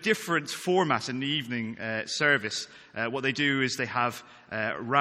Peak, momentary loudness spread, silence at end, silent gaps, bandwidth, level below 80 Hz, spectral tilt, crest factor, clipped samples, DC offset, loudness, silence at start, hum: -6 dBFS; 9 LU; 0 s; none; 16 kHz; -70 dBFS; -4 dB/octave; 22 dB; under 0.1%; under 0.1%; -28 LUFS; 0 s; none